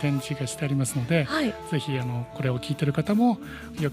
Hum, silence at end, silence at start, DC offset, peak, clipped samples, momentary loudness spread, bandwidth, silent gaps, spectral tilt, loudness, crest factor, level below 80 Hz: none; 0 s; 0 s; under 0.1%; -8 dBFS; under 0.1%; 8 LU; 16 kHz; none; -6 dB/octave; -26 LUFS; 18 dB; -54 dBFS